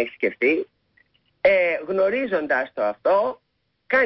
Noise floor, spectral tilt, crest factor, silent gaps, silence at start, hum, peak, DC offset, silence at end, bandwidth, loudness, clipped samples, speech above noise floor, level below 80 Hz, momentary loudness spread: -63 dBFS; -9 dB/octave; 16 dB; none; 0 s; none; -6 dBFS; under 0.1%; 0 s; 5.8 kHz; -22 LUFS; under 0.1%; 42 dB; -64 dBFS; 7 LU